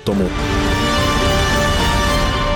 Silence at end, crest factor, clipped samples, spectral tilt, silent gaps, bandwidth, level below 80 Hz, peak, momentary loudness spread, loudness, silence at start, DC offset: 0 s; 10 dB; under 0.1%; -4.5 dB/octave; none; over 20 kHz; -22 dBFS; -6 dBFS; 3 LU; -16 LUFS; 0 s; under 0.1%